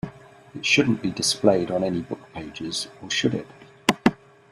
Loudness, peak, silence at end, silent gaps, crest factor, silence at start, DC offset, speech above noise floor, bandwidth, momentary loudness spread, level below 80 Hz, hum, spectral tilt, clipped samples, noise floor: -23 LUFS; -2 dBFS; 0.4 s; none; 22 dB; 0.05 s; under 0.1%; 18 dB; 14.5 kHz; 15 LU; -56 dBFS; none; -4 dB/octave; under 0.1%; -42 dBFS